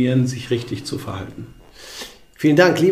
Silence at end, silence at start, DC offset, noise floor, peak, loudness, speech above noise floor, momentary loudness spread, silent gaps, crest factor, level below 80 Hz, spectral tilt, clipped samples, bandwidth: 0 s; 0 s; under 0.1%; -38 dBFS; 0 dBFS; -19 LUFS; 19 dB; 23 LU; none; 18 dB; -52 dBFS; -6 dB/octave; under 0.1%; 15.5 kHz